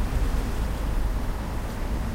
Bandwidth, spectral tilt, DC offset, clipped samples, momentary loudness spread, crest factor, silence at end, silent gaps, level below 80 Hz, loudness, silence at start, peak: 16 kHz; -6 dB/octave; under 0.1%; under 0.1%; 4 LU; 12 dB; 0 s; none; -26 dBFS; -30 LUFS; 0 s; -14 dBFS